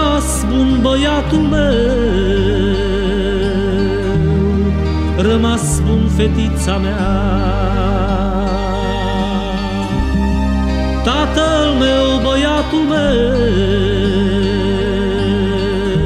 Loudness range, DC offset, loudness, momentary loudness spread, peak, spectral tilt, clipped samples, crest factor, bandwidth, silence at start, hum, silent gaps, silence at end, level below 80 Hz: 3 LU; under 0.1%; -15 LUFS; 4 LU; -2 dBFS; -6 dB/octave; under 0.1%; 12 dB; 14 kHz; 0 s; none; none; 0 s; -20 dBFS